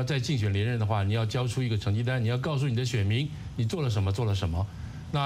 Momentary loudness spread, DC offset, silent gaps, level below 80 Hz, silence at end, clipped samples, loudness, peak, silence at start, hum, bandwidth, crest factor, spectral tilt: 5 LU; under 0.1%; none; -48 dBFS; 0 s; under 0.1%; -28 LUFS; -12 dBFS; 0 s; none; 12 kHz; 14 dB; -6.5 dB/octave